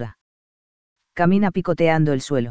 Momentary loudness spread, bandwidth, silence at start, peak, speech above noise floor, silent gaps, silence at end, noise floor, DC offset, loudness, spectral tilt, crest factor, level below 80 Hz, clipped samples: 13 LU; 8 kHz; 0 s; -4 dBFS; over 72 dB; 0.21-0.96 s; 0 s; under -90 dBFS; 2%; -19 LUFS; -7.5 dB/octave; 18 dB; -50 dBFS; under 0.1%